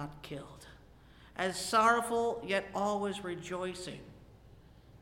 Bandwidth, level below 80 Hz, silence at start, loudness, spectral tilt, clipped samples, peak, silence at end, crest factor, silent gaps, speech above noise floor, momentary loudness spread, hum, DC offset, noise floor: 16.5 kHz; -62 dBFS; 0 s; -33 LUFS; -4 dB/octave; under 0.1%; -14 dBFS; 0.05 s; 22 dB; none; 24 dB; 20 LU; none; under 0.1%; -57 dBFS